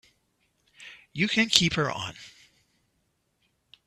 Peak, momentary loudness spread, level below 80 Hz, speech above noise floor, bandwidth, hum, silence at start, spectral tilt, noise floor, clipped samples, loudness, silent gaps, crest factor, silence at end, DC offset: 0 dBFS; 26 LU; -60 dBFS; 48 dB; 14.5 kHz; none; 0.8 s; -3 dB/octave; -74 dBFS; under 0.1%; -24 LUFS; none; 30 dB; 1.6 s; under 0.1%